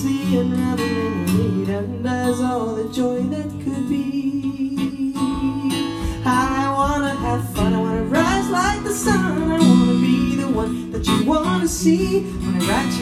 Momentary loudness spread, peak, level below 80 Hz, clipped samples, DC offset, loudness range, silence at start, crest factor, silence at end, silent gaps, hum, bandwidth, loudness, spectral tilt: 6 LU; -2 dBFS; -36 dBFS; under 0.1%; under 0.1%; 5 LU; 0 s; 18 dB; 0 s; none; none; 15 kHz; -20 LUFS; -5.5 dB/octave